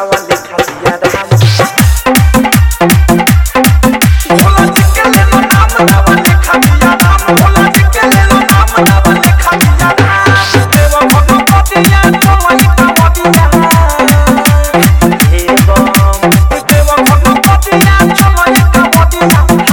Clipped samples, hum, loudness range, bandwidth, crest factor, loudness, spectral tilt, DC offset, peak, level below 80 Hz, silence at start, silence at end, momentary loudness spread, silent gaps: 3%; none; 1 LU; over 20 kHz; 6 dB; -6 LUFS; -5 dB/octave; under 0.1%; 0 dBFS; -12 dBFS; 0 s; 0 s; 2 LU; none